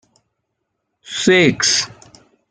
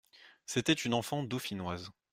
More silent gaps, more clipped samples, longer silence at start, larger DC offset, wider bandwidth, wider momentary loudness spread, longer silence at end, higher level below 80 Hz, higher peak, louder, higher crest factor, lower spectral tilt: neither; neither; first, 1.1 s vs 0.2 s; neither; second, 10 kHz vs 16 kHz; first, 15 LU vs 11 LU; first, 0.65 s vs 0.2 s; first, -56 dBFS vs -68 dBFS; first, -2 dBFS vs -14 dBFS; first, -14 LUFS vs -34 LUFS; about the same, 18 dB vs 20 dB; about the same, -3 dB/octave vs -4 dB/octave